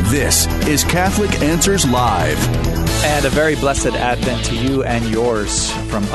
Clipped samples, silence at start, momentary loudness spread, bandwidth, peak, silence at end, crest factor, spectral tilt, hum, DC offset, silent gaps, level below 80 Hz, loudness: under 0.1%; 0 s; 4 LU; 12.5 kHz; -2 dBFS; 0 s; 14 dB; -4 dB/octave; none; under 0.1%; none; -26 dBFS; -16 LUFS